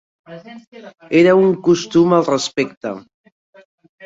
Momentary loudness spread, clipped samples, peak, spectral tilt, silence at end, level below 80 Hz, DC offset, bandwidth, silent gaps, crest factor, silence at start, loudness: 20 LU; under 0.1%; -2 dBFS; -5.5 dB/octave; 1.05 s; -58 dBFS; under 0.1%; 7.8 kHz; 0.67-0.72 s, 2.77-2.81 s; 16 dB; 0.3 s; -15 LUFS